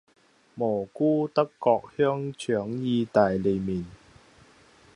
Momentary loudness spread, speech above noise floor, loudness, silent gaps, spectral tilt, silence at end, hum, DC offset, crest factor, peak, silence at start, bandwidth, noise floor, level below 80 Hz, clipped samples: 8 LU; 31 dB; -26 LUFS; none; -7.5 dB/octave; 1 s; none; under 0.1%; 20 dB; -6 dBFS; 0.55 s; 11 kHz; -56 dBFS; -58 dBFS; under 0.1%